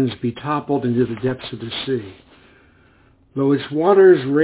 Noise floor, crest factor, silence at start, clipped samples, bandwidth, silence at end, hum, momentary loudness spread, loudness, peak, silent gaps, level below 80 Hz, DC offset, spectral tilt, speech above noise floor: -54 dBFS; 18 dB; 0 s; under 0.1%; 4 kHz; 0 s; none; 15 LU; -18 LUFS; -2 dBFS; none; -54 dBFS; under 0.1%; -11.5 dB/octave; 36 dB